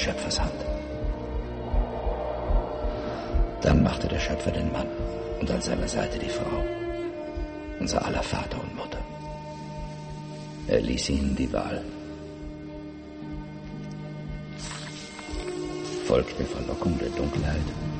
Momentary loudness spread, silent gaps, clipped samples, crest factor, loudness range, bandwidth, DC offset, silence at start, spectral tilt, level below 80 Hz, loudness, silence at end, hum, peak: 13 LU; none; under 0.1%; 22 dB; 9 LU; 8.8 kHz; under 0.1%; 0 s; -5.5 dB/octave; -34 dBFS; -30 LUFS; 0 s; none; -6 dBFS